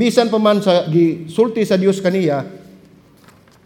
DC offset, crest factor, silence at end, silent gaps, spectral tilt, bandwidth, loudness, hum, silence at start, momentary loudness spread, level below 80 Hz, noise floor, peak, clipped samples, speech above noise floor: under 0.1%; 16 dB; 1.1 s; none; -6.5 dB/octave; 16.5 kHz; -16 LUFS; none; 0 s; 5 LU; -62 dBFS; -48 dBFS; 0 dBFS; under 0.1%; 33 dB